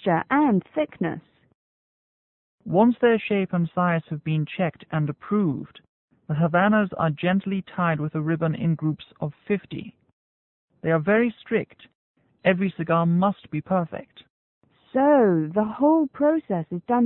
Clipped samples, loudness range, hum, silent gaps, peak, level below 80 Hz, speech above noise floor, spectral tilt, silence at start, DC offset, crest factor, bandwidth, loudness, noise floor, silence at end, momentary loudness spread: under 0.1%; 4 LU; none; 1.55-2.58 s, 5.89-6.08 s, 10.13-10.68 s, 11.95-12.15 s, 14.30-14.61 s; -6 dBFS; -62 dBFS; over 67 dB; -12 dB/octave; 0 s; under 0.1%; 18 dB; 4.1 kHz; -23 LUFS; under -90 dBFS; 0 s; 12 LU